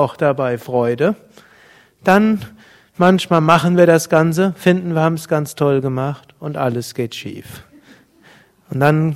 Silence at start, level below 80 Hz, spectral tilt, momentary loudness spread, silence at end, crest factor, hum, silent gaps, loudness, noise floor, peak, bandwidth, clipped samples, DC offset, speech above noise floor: 0 s; -56 dBFS; -6.5 dB/octave; 16 LU; 0 s; 16 dB; none; none; -16 LUFS; -49 dBFS; 0 dBFS; 16 kHz; 0.2%; under 0.1%; 33 dB